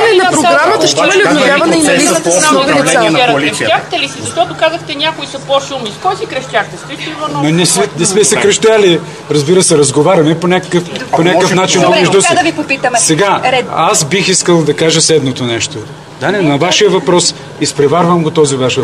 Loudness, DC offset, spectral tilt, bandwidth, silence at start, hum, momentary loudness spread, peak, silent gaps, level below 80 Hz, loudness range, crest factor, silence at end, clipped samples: -9 LUFS; 0.2%; -3.5 dB/octave; 13.5 kHz; 0 s; none; 8 LU; 0 dBFS; none; -50 dBFS; 5 LU; 10 dB; 0 s; 0.2%